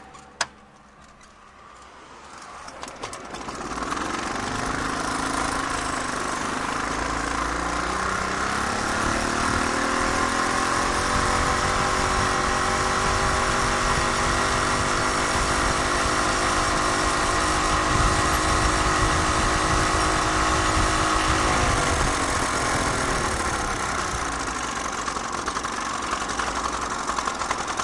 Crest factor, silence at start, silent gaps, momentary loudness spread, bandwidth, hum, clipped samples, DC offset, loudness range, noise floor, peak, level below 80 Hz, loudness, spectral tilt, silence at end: 18 dB; 0 s; none; 7 LU; 12 kHz; none; under 0.1%; under 0.1%; 7 LU; -49 dBFS; -6 dBFS; -34 dBFS; -23 LUFS; -3 dB/octave; 0 s